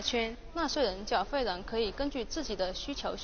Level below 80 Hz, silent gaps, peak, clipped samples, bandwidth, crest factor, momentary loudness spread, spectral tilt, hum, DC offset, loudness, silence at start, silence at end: -46 dBFS; none; -16 dBFS; under 0.1%; 7 kHz; 18 dB; 6 LU; -2 dB/octave; none; under 0.1%; -33 LUFS; 0 s; 0 s